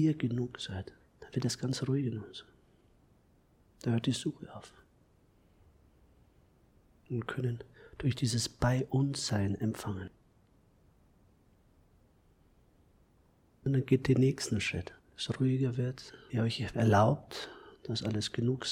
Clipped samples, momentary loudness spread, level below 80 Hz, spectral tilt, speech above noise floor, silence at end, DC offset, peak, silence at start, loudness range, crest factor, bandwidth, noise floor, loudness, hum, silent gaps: under 0.1%; 17 LU; -60 dBFS; -6 dB/octave; 35 dB; 0 s; under 0.1%; -12 dBFS; 0 s; 11 LU; 22 dB; 15 kHz; -67 dBFS; -33 LUFS; none; none